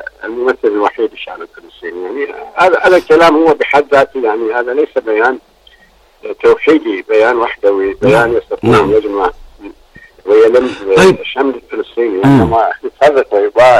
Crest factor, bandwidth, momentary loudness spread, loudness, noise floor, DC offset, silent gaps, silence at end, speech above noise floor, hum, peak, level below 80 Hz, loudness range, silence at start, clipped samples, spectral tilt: 12 dB; 12.5 kHz; 14 LU; -11 LUFS; -46 dBFS; under 0.1%; none; 0 s; 36 dB; none; 0 dBFS; -42 dBFS; 3 LU; 0 s; under 0.1%; -6 dB/octave